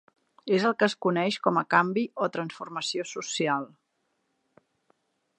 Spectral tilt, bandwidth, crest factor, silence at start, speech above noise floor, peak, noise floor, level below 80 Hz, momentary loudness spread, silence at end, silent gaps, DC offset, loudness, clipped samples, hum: -4.5 dB/octave; 11 kHz; 24 dB; 0.45 s; 49 dB; -6 dBFS; -76 dBFS; -80 dBFS; 10 LU; 1.75 s; none; under 0.1%; -27 LUFS; under 0.1%; none